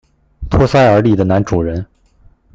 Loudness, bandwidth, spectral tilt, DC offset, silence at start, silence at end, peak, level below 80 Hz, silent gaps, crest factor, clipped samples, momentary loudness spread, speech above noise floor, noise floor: -13 LUFS; 7.8 kHz; -7.5 dB/octave; under 0.1%; 0.4 s; 0.7 s; 0 dBFS; -30 dBFS; none; 14 dB; under 0.1%; 18 LU; 37 dB; -48 dBFS